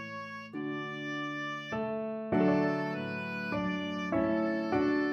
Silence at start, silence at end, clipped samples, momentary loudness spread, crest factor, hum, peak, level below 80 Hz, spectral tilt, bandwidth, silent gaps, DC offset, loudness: 0 s; 0 s; under 0.1%; 9 LU; 16 dB; none; -16 dBFS; -62 dBFS; -7 dB/octave; 6.8 kHz; none; under 0.1%; -33 LUFS